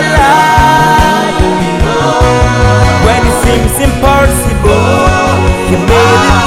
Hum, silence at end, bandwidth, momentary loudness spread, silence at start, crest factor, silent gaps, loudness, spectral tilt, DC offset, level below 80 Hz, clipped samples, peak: none; 0 s; 16.5 kHz; 4 LU; 0 s; 8 dB; none; -8 LUFS; -5 dB/octave; 3%; -16 dBFS; 4%; 0 dBFS